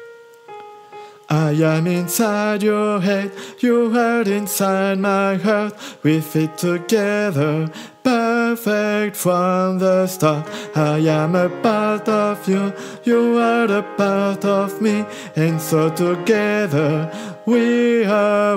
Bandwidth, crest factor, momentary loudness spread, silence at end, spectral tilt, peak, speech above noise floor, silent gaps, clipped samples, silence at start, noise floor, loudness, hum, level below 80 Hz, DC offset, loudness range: 16 kHz; 16 dB; 7 LU; 0 s; -6 dB/octave; -2 dBFS; 23 dB; none; under 0.1%; 0 s; -41 dBFS; -18 LUFS; none; -70 dBFS; under 0.1%; 1 LU